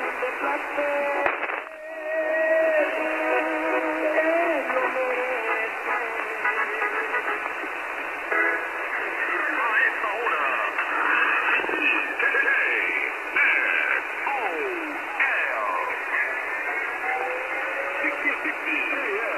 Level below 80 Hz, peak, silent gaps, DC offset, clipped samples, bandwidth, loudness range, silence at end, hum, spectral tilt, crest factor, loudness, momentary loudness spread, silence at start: -68 dBFS; -4 dBFS; none; under 0.1%; under 0.1%; 14.5 kHz; 4 LU; 0 s; none; -2.5 dB/octave; 20 dB; -24 LUFS; 7 LU; 0 s